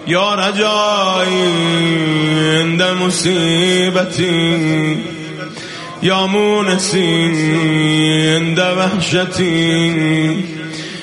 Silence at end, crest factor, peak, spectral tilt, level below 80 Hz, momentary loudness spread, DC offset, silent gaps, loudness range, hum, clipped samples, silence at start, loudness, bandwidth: 0 s; 14 dB; -2 dBFS; -4.5 dB/octave; -52 dBFS; 9 LU; under 0.1%; none; 2 LU; none; under 0.1%; 0 s; -14 LUFS; 11.5 kHz